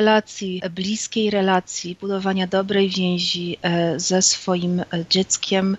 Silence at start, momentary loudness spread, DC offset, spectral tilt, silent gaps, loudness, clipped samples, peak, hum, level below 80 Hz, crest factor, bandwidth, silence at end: 0 s; 9 LU; under 0.1%; -3.5 dB/octave; none; -21 LUFS; under 0.1%; -2 dBFS; none; -60 dBFS; 18 dB; 8.2 kHz; 0 s